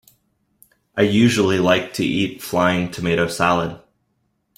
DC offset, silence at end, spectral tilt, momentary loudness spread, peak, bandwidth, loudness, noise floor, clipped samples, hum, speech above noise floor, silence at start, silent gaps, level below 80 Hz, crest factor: under 0.1%; 0.8 s; -5.5 dB/octave; 7 LU; -2 dBFS; 16.5 kHz; -19 LUFS; -69 dBFS; under 0.1%; none; 51 dB; 0.95 s; none; -52 dBFS; 18 dB